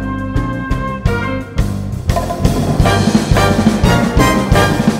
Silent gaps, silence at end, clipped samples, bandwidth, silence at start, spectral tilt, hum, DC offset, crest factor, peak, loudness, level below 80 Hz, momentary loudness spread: none; 0 s; 0.3%; 16.5 kHz; 0 s; -6 dB/octave; none; under 0.1%; 14 dB; 0 dBFS; -14 LUFS; -22 dBFS; 8 LU